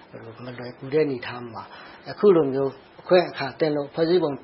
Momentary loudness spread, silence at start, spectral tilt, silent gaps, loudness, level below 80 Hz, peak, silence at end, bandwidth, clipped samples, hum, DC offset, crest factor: 20 LU; 0.15 s; -11 dB/octave; none; -23 LUFS; -66 dBFS; -4 dBFS; 0.05 s; 5.8 kHz; under 0.1%; none; under 0.1%; 20 dB